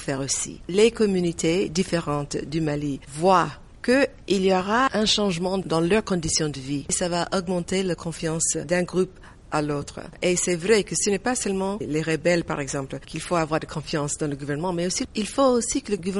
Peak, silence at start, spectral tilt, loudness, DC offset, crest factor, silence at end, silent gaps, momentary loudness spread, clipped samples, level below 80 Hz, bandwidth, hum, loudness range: -6 dBFS; 0 s; -4 dB/octave; -24 LUFS; under 0.1%; 18 dB; 0 s; none; 8 LU; under 0.1%; -46 dBFS; 11.5 kHz; none; 4 LU